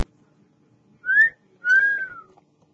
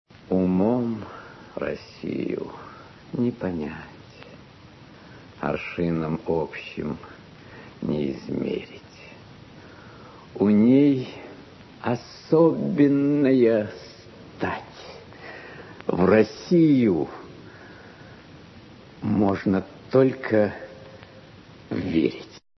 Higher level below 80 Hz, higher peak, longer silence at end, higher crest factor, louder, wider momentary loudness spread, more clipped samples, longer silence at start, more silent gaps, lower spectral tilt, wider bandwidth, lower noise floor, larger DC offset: second, -62 dBFS vs -56 dBFS; about the same, -8 dBFS vs -6 dBFS; first, 0.55 s vs 0.2 s; about the same, 16 dB vs 20 dB; first, -19 LUFS vs -23 LUFS; second, 16 LU vs 26 LU; neither; second, 0 s vs 0.3 s; neither; second, -2.5 dB/octave vs -8.5 dB/octave; first, 8 kHz vs 6.2 kHz; first, -60 dBFS vs -47 dBFS; neither